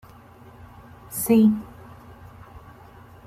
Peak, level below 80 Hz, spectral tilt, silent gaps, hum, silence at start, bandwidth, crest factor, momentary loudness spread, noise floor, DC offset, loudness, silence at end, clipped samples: -8 dBFS; -54 dBFS; -6.5 dB/octave; none; none; 1.1 s; 16 kHz; 18 dB; 28 LU; -47 dBFS; under 0.1%; -21 LUFS; 0.7 s; under 0.1%